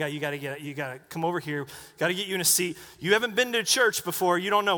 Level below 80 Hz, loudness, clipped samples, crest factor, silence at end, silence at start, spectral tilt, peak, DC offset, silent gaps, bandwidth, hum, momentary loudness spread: -68 dBFS; -26 LUFS; under 0.1%; 20 dB; 0 s; 0 s; -2.5 dB/octave; -6 dBFS; under 0.1%; none; over 20 kHz; none; 12 LU